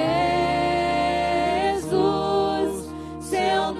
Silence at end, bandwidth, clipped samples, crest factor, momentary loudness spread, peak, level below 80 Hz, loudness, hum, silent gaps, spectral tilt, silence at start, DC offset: 0 s; 14.5 kHz; under 0.1%; 12 dB; 6 LU; -10 dBFS; -46 dBFS; -23 LUFS; none; none; -5 dB/octave; 0 s; under 0.1%